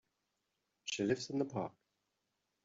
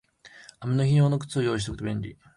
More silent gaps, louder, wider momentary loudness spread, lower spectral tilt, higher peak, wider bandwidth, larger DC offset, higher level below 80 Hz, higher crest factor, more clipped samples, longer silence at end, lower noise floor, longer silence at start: neither; second, -39 LUFS vs -26 LUFS; about the same, 10 LU vs 12 LU; second, -4.5 dB/octave vs -7 dB/octave; second, -20 dBFS vs -12 dBFS; second, 7.8 kHz vs 11.5 kHz; neither; second, -78 dBFS vs -50 dBFS; first, 22 dB vs 14 dB; neither; first, 0.95 s vs 0.25 s; first, -86 dBFS vs -51 dBFS; first, 0.85 s vs 0.25 s